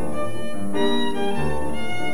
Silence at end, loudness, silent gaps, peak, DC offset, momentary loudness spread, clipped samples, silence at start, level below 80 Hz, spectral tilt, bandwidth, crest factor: 0 s; -26 LUFS; none; -8 dBFS; 10%; 7 LU; under 0.1%; 0 s; -44 dBFS; -5 dB/octave; 17.5 kHz; 16 dB